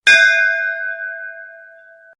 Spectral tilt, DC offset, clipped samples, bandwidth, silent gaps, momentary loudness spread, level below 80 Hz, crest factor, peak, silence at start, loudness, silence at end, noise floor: 1.5 dB/octave; under 0.1%; under 0.1%; 11.5 kHz; none; 22 LU; -62 dBFS; 18 dB; 0 dBFS; 0.05 s; -14 LUFS; 0.6 s; -44 dBFS